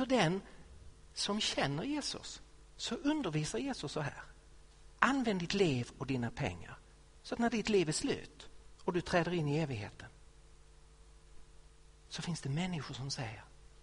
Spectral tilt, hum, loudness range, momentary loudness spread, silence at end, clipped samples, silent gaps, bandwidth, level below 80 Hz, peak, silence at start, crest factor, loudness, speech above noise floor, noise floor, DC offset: -4.5 dB/octave; none; 7 LU; 21 LU; 0.15 s; under 0.1%; none; 10.5 kHz; -58 dBFS; -8 dBFS; 0 s; 28 dB; -36 LUFS; 24 dB; -59 dBFS; under 0.1%